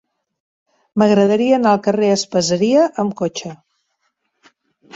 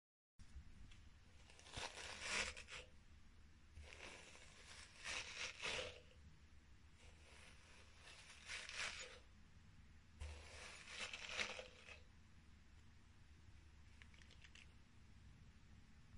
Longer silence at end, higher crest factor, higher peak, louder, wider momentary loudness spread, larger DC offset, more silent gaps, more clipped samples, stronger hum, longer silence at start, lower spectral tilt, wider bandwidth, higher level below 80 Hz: first, 1.4 s vs 0 s; second, 16 dB vs 28 dB; first, 0 dBFS vs -28 dBFS; first, -16 LUFS vs -51 LUFS; second, 10 LU vs 22 LU; neither; neither; neither; neither; first, 0.95 s vs 0.4 s; first, -5 dB/octave vs -1.5 dB/octave; second, 8 kHz vs 11.5 kHz; first, -60 dBFS vs -68 dBFS